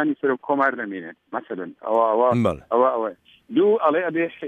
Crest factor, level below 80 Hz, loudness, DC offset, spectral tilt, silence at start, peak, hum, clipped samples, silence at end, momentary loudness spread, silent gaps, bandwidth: 16 dB; -58 dBFS; -21 LUFS; under 0.1%; -8 dB/octave; 0 s; -6 dBFS; none; under 0.1%; 0 s; 13 LU; none; 9.6 kHz